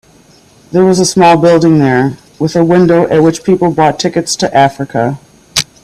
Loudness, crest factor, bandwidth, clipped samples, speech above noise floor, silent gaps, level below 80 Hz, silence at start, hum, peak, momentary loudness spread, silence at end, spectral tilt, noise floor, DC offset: -10 LUFS; 10 dB; 15 kHz; under 0.1%; 35 dB; none; -46 dBFS; 0.7 s; none; 0 dBFS; 9 LU; 0.2 s; -5.5 dB/octave; -43 dBFS; under 0.1%